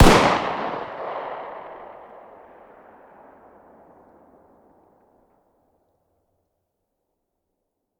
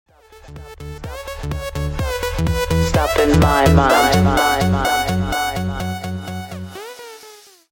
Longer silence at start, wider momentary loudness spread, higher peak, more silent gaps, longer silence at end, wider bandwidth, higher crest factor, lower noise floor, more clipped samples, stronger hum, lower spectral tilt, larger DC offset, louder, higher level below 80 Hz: second, 0 s vs 0.35 s; first, 30 LU vs 21 LU; about the same, 0 dBFS vs -2 dBFS; neither; first, 6.1 s vs 0.35 s; about the same, 18 kHz vs 17 kHz; first, 26 dB vs 16 dB; first, -78 dBFS vs -43 dBFS; neither; neither; about the same, -5 dB/octave vs -5.5 dB/octave; neither; second, -23 LUFS vs -17 LUFS; second, -34 dBFS vs -28 dBFS